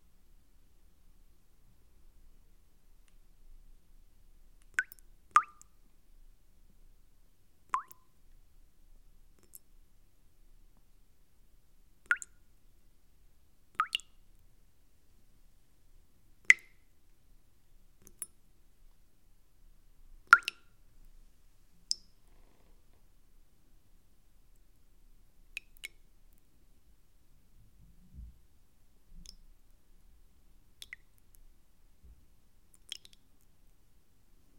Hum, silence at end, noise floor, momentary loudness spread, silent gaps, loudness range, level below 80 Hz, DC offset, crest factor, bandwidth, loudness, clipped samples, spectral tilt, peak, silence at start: none; 6.35 s; -66 dBFS; 31 LU; none; 23 LU; -62 dBFS; under 0.1%; 38 dB; 16.5 kHz; -32 LUFS; under 0.1%; 0.5 dB/octave; -2 dBFS; 4.8 s